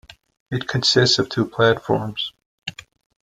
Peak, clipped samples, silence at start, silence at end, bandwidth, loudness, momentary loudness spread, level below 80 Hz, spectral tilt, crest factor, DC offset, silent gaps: -2 dBFS; under 0.1%; 0.5 s; 0.55 s; 13 kHz; -19 LUFS; 18 LU; -54 dBFS; -4.5 dB/octave; 18 dB; under 0.1%; 2.46-2.58 s